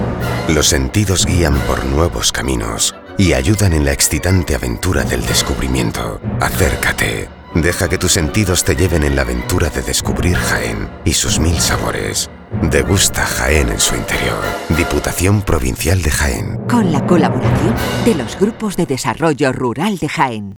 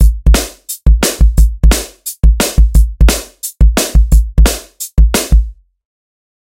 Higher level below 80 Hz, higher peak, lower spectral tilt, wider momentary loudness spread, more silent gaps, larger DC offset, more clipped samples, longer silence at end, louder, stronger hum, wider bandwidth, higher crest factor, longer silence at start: second, -26 dBFS vs -10 dBFS; about the same, 0 dBFS vs 0 dBFS; about the same, -4 dB/octave vs -4.5 dB/octave; about the same, 6 LU vs 8 LU; neither; neither; second, under 0.1% vs 0.2%; second, 0 s vs 0.95 s; second, -15 LUFS vs -12 LUFS; neither; first, over 20 kHz vs 16.5 kHz; about the same, 14 dB vs 10 dB; about the same, 0 s vs 0 s